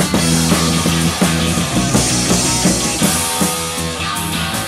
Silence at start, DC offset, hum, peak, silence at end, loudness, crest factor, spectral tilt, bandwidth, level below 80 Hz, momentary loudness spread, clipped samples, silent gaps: 0 s; under 0.1%; none; 0 dBFS; 0 s; -14 LUFS; 14 dB; -3.5 dB/octave; 16 kHz; -32 dBFS; 5 LU; under 0.1%; none